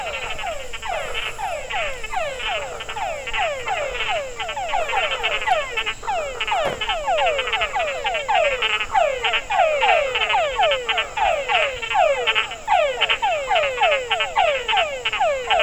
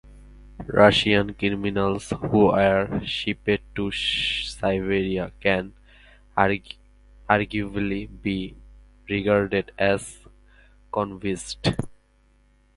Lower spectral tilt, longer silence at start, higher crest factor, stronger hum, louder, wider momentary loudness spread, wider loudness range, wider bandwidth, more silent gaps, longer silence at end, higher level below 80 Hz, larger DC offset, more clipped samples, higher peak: second, -1 dB/octave vs -5.5 dB/octave; about the same, 0 s vs 0.05 s; second, 18 dB vs 24 dB; second, none vs 50 Hz at -45 dBFS; about the same, -21 LUFS vs -23 LUFS; second, 8 LU vs 12 LU; about the same, 6 LU vs 6 LU; first, over 20 kHz vs 11.5 kHz; neither; second, 0 s vs 0.85 s; about the same, -42 dBFS vs -46 dBFS; neither; neither; second, -4 dBFS vs 0 dBFS